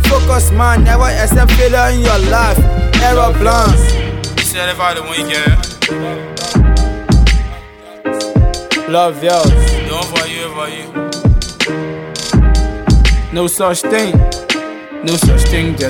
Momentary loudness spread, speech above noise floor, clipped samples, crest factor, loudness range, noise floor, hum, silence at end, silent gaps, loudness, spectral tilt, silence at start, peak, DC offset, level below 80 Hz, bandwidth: 10 LU; 22 dB; under 0.1%; 10 dB; 4 LU; -32 dBFS; none; 0 s; none; -13 LUFS; -5 dB/octave; 0 s; 0 dBFS; under 0.1%; -14 dBFS; 18.5 kHz